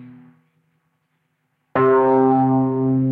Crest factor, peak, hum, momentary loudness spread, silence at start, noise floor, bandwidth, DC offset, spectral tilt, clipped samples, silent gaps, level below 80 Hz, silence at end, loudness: 14 dB; -6 dBFS; none; 4 LU; 0 s; -70 dBFS; 3.8 kHz; under 0.1%; -11.5 dB/octave; under 0.1%; none; -60 dBFS; 0 s; -17 LUFS